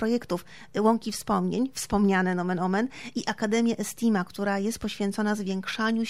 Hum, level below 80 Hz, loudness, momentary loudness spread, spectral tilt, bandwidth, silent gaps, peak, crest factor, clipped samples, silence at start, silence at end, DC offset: none; -54 dBFS; -27 LUFS; 7 LU; -5.5 dB/octave; 15.5 kHz; none; -10 dBFS; 18 dB; under 0.1%; 0 s; 0 s; 0.3%